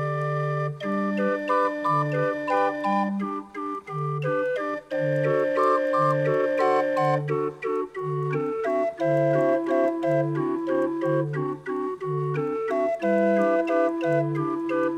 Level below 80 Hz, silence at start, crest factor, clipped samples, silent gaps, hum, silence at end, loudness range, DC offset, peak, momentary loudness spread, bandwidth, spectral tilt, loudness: -68 dBFS; 0 s; 14 dB; under 0.1%; none; none; 0 s; 3 LU; under 0.1%; -10 dBFS; 7 LU; 10 kHz; -8 dB/octave; -25 LUFS